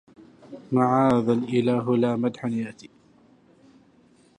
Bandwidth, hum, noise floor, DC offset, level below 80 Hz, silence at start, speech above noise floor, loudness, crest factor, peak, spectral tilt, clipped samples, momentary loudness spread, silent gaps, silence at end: 9.8 kHz; none; -58 dBFS; under 0.1%; -66 dBFS; 0.5 s; 35 dB; -23 LUFS; 18 dB; -8 dBFS; -8 dB/octave; under 0.1%; 14 LU; none; 1.55 s